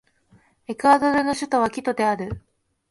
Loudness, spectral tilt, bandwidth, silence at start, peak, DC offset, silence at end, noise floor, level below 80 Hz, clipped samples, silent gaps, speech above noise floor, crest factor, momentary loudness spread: -21 LUFS; -5 dB/octave; 11.5 kHz; 0.7 s; -4 dBFS; under 0.1%; 0.5 s; -58 dBFS; -52 dBFS; under 0.1%; none; 38 dB; 18 dB; 16 LU